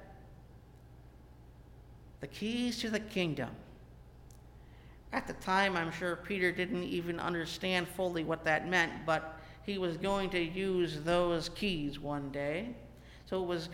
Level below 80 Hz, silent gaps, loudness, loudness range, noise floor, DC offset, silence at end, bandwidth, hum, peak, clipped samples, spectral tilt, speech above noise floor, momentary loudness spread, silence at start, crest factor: -56 dBFS; none; -34 LUFS; 6 LU; -55 dBFS; under 0.1%; 0 s; 16.5 kHz; none; -14 dBFS; under 0.1%; -5 dB/octave; 21 dB; 15 LU; 0 s; 22 dB